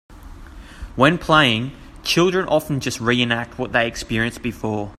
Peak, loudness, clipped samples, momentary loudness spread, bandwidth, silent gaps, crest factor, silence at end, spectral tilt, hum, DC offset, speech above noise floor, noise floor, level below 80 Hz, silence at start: 0 dBFS; -19 LUFS; under 0.1%; 12 LU; 15.5 kHz; none; 20 dB; 0.05 s; -4.5 dB/octave; none; under 0.1%; 19 dB; -38 dBFS; -42 dBFS; 0.1 s